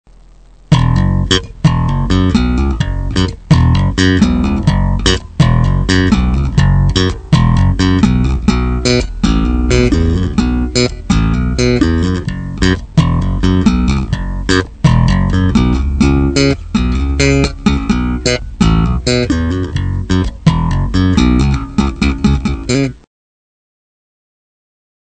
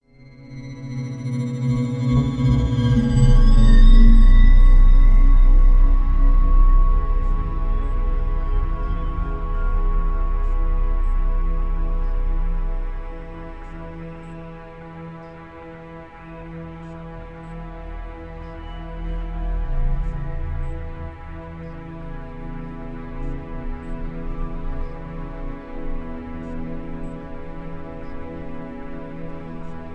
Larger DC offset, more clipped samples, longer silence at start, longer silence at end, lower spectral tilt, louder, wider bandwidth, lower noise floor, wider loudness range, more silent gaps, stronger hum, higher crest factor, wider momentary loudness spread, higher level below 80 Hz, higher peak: first, 0.5% vs 0.2%; neither; first, 0.7 s vs 0.4 s; first, 2.1 s vs 0 s; second, -6 dB/octave vs -8 dB/octave; first, -13 LUFS vs -23 LUFS; first, 9 kHz vs 5 kHz; about the same, -41 dBFS vs -44 dBFS; second, 2 LU vs 19 LU; neither; neither; about the same, 12 dB vs 16 dB; second, 5 LU vs 20 LU; about the same, -18 dBFS vs -18 dBFS; about the same, 0 dBFS vs -2 dBFS